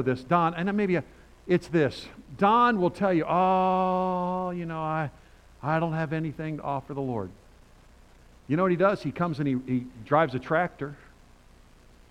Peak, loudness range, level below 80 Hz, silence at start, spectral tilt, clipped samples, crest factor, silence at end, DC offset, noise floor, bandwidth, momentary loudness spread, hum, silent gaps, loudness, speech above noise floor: -8 dBFS; 7 LU; -56 dBFS; 0 s; -8 dB/octave; under 0.1%; 20 dB; 1.15 s; under 0.1%; -54 dBFS; 10.5 kHz; 10 LU; none; none; -26 LUFS; 28 dB